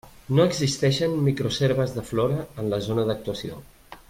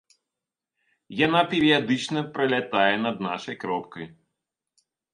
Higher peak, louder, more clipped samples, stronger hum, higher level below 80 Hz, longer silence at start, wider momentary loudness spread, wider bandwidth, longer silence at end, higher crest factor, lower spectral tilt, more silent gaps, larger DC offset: second, -8 dBFS vs -4 dBFS; about the same, -24 LUFS vs -24 LUFS; neither; neither; first, -50 dBFS vs -66 dBFS; second, 0.05 s vs 1.1 s; second, 9 LU vs 15 LU; first, 16 kHz vs 11 kHz; second, 0.15 s vs 1.05 s; second, 16 dB vs 22 dB; about the same, -6 dB/octave vs -5 dB/octave; neither; neither